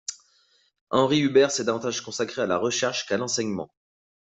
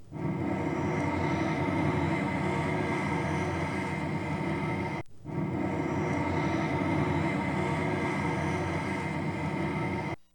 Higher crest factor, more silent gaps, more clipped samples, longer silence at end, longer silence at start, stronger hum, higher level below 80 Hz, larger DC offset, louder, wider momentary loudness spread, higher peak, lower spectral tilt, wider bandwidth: first, 20 dB vs 14 dB; first, 0.81-0.87 s vs none; neither; first, 0.65 s vs 0.1 s; about the same, 0.1 s vs 0 s; neither; second, -66 dBFS vs -52 dBFS; neither; first, -24 LUFS vs -31 LUFS; first, 11 LU vs 4 LU; first, -6 dBFS vs -16 dBFS; second, -3.5 dB/octave vs -7 dB/octave; second, 8.2 kHz vs 18 kHz